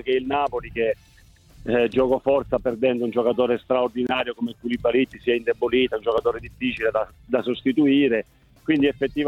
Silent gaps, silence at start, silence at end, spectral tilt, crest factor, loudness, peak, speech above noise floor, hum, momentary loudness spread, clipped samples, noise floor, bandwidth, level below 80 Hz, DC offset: none; 0.05 s; 0 s; -7 dB/octave; 14 dB; -23 LUFS; -8 dBFS; 27 dB; none; 7 LU; under 0.1%; -49 dBFS; 8 kHz; -50 dBFS; under 0.1%